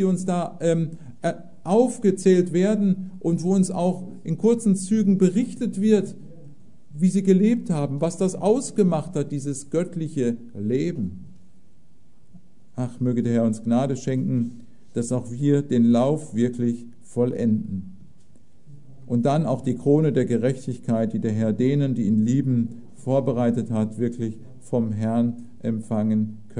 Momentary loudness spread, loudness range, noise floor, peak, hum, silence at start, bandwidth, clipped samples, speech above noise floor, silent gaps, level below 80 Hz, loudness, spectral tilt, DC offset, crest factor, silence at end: 12 LU; 5 LU; -59 dBFS; -6 dBFS; none; 0 s; 11 kHz; under 0.1%; 37 dB; none; -62 dBFS; -23 LUFS; -7.5 dB/octave; 1%; 16 dB; 0 s